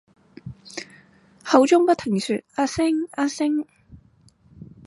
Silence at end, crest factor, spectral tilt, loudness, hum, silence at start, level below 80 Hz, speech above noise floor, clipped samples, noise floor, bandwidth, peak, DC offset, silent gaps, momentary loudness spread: 0.2 s; 22 dB; -5 dB/octave; -21 LUFS; none; 0.45 s; -56 dBFS; 36 dB; under 0.1%; -56 dBFS; 11.5 kHz; 0 dBFS; under 0.1%; none; 24 LU